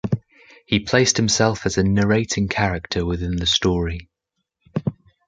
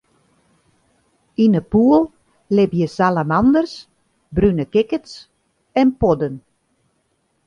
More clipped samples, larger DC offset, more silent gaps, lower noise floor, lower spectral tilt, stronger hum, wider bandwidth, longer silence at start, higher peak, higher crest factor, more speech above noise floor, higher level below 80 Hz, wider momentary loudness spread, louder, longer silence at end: neither; neither; neither; first, -78 dBFS vs -66 dBFS; second, -4 dB/octave vs -8 dB/octave; neither; about the same, 9.6 kHz vs 9.8 kHz; second, 0.05 s vs 1.4 s; about the same, -2 dBFS vs -2 dBFS; about the same, 18 dB vs 18 dB; first, 59 dB vs 50 dB; first, -36 dBFS vs -42 dBFS; about the same, 11 LU vs 13 LU; second, -20 LUFS vs -17 LUFS; second, 0.35 s vs 1.1 s